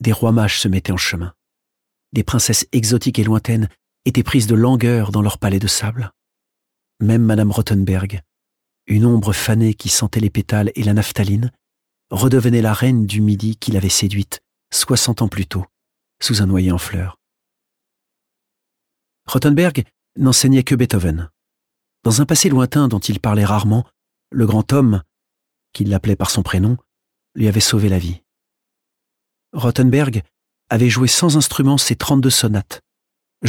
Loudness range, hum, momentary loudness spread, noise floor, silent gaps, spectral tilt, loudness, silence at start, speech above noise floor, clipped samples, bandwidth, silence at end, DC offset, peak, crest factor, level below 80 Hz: 4 LU; none; 11 LU; -80 dBFS; none; -5 dB/octave; -16 LUFS; 0 s; 64 dB; under 0.1%; 18 kHz; 0 s; under 0.1%; -2 dBFS; 14 dB; -40 dBFS